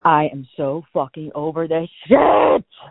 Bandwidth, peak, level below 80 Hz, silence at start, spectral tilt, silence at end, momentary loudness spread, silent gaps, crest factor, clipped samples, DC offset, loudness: 4.1 kHz; 0 dBFS; -52 dBFS; 0.05 s; -11 dB/octave; 0.05 s; 12 LU; none; 18 dB; under 0.1%; under 0.1%; -18 LUFS